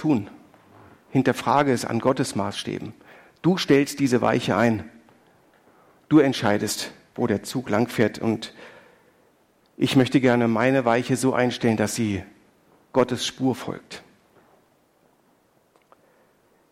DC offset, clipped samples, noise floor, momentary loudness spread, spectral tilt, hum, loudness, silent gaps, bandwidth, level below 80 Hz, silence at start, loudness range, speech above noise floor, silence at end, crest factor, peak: under 0.1%; under 0.1%; -62 dBFS; 13 LU; -5.5 dB/octave; none; -23 LUFS; none; 16 kHz; -62 dBFS; 0 s; 8 LU; 40 dB; 2.7 s; 18 dB; -6 dBFS